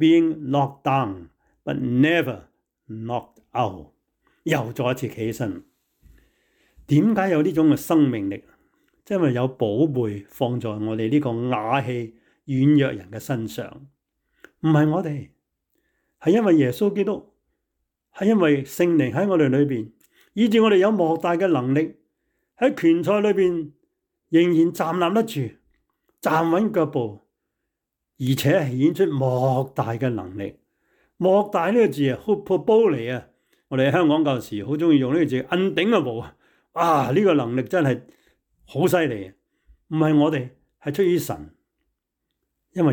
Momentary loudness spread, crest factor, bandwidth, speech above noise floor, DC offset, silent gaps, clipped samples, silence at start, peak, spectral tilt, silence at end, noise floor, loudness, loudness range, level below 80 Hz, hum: 14 LU; 14 dB; 19 kHz; 61 dB; under 0.1%; none; under 0.1%; 0 s; -8 dBFS; -7 dB/octave; 0 s; -82 dBFS; -21 LUFS; 5 LU; -62 dBFS; none